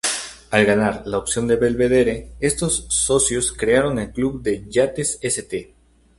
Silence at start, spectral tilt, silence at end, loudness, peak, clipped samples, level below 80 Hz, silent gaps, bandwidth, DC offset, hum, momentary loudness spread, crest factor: 0.05 s; -3.5 dB/octave; 0.55 s; -20 LUFS; 0 dBFS; under 0.1%; -42 dBFS; none; 12 kHz; under 0.1%; none; 7 LU; 20 dB